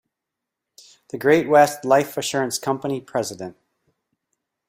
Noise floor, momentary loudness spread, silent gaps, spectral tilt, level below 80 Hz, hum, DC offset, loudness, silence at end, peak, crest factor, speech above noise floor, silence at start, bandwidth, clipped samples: -84 dBFS; 16 LU; none; -4 dB/octave; -66 dBFS; none; under 0.1%; -20 LUFS; 1.15 s; -2 dBFS; 20 dB; 64 dB; 1.15 s; 16 kHz; under 0.1%